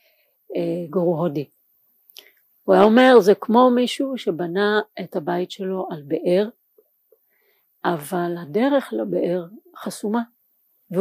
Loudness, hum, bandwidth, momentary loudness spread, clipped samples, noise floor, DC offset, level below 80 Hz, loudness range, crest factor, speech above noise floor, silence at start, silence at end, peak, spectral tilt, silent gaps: -20 LUFS; none; 15.5 kHz; 15 LU; under 0.1%; -65 dBFS; under 0.1%; -70 dBFS; 9 LU; 20 dB; 45 dB; 0.5 s; 0 s; -2 dBFS; -6 dB/octave; none